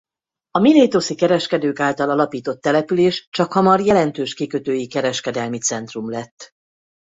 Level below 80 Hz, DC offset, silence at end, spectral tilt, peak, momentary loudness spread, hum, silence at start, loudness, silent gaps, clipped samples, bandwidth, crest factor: -58 dBFS; under 0.1%; 0.55 s; -4.5 dB/octave; -2 dBFS; 11 LU; none; 0.55 s; -18 LUFS; 3.27-3.32 s, 6.31-6.37 s; under 0.1%; 8 kHz; 16 dB